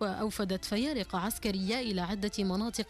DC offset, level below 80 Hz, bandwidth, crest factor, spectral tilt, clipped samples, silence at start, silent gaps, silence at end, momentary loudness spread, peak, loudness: under 0.1%; -52 dBFS; 15.5 kHz; 12 dB; -4.5 dB/octave; under 0.1%; 0 s; none; 0 s; 2 LU; -20 dBFS; -33 LUFS